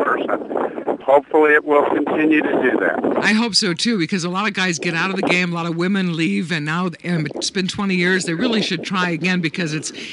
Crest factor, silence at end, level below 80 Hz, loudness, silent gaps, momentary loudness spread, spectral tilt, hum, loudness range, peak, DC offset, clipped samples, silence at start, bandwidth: 16 dB; 0 s; -62 dBFS; -18 LUFS; none; 8 LU; -4.5 dB/octave; none; 4 LU; -2 dBFS; under 0.1%; under 0.1%; 0 s; 11.5 kHz